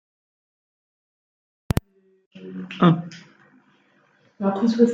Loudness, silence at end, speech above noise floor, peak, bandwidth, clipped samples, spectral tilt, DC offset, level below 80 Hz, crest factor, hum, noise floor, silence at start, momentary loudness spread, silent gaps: -22 LUFS; 0 s; 40 dB; -2 dBFS; 15.5 kHz; under 0.1%; -7.5 dB/octave; under 0.1%; -46 dBFS; 22 dB; none; -61 dBFS; 2.35 s; 21 LU; none